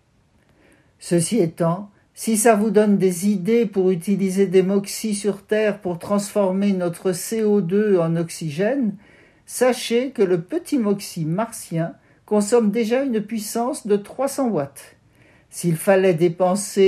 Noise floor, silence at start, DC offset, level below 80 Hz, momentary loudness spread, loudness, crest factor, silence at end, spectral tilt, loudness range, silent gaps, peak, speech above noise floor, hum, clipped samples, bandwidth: -59 dBFS; 1 s; under 0.1%; -66 dBFS; 9 LU; -20 LUFS; 18 dB; 0 s; -5.5 dB/octave; 4 LU; none; -2 dBFS; 40 dB; none; under 0.1%; 14.5 kHz